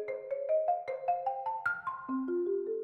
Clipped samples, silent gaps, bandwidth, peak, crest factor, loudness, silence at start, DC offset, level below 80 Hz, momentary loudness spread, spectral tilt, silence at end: under 0.1%; none; 8.6 kHz; -20 dBFS; 14 dB; -34 LUFS; 0 s; under 0.1%; -80 dBFS; 6 LU; -7 dB/octave; 0 s